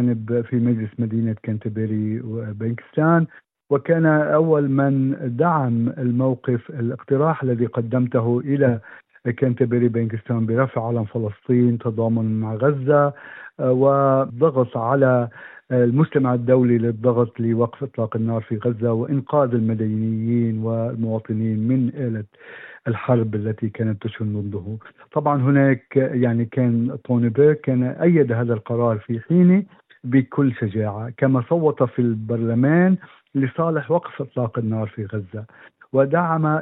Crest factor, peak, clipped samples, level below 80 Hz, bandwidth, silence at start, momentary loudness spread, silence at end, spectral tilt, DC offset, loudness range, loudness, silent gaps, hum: 16 dB; -4 dBFS; under 0.1%; -72 dBFS; 3.9 kHz; 0 s; 10 LU; 0 s; -13 dB/octave; under 0.1%; 4 LU; -20 LUFS; none; none